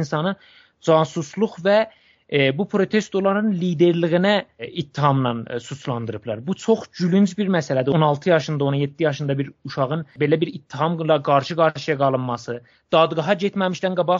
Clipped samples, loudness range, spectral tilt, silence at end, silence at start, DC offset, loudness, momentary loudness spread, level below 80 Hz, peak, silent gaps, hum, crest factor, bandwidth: under 0.1%; 2 LU; -5.5 dB/octave; 0 s; 0 s; under 0.1%; -21 LUFS; 10 LU; -64 dBFS; -4 dBFS; none; none; 18 dB; 7.8 kHz